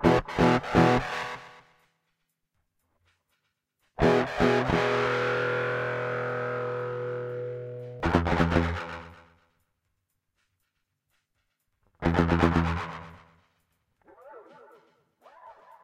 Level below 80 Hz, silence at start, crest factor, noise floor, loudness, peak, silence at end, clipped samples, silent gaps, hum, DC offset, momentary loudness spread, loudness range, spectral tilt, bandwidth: -44 dBFS; 0 s; 20 dB; -79 dBFS; -26 LUFS; -8 dBFS; 0.3 s; under 0.1%; none; none; under 0.1%; 14 LU; 8 LU; -7 dB/octave; 12 kHz